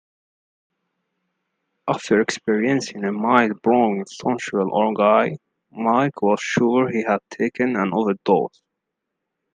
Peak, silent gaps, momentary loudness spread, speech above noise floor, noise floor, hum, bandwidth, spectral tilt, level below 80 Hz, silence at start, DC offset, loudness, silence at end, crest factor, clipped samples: 0 dBFS; none; 8 LU; 61 dB; -80 dBFS; none; 9.6 kHz; -5.5 dB/octave; -66 dBFS; 1.85 s; under 0.1%; -20 LUFS; 1.1 s; 20 dB; under 0.1%